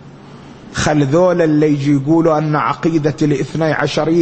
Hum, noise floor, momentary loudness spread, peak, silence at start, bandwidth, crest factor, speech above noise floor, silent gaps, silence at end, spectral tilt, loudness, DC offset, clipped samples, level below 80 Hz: none; -36 dBFS; 4 LU; 0 dBFS; 0 s; 8.6 kHz; 14 dB; 23 dB; none; 0 s; -6.5 dB/octave; -14 LUFS; under 0.1%; under 0.1%; -44 dBFS